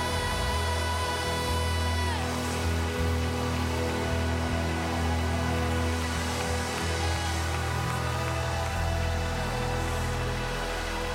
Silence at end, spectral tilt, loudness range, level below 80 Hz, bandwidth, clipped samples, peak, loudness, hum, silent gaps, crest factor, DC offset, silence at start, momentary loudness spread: 0 s; -4.5 dB/octave; 1 LU; -36 dBFS; 16.5 kHz; under 0.1%; -16 dBFS; -29 LUFS; none; none; 12 dB; under 0.1%; 0 s; 2 LU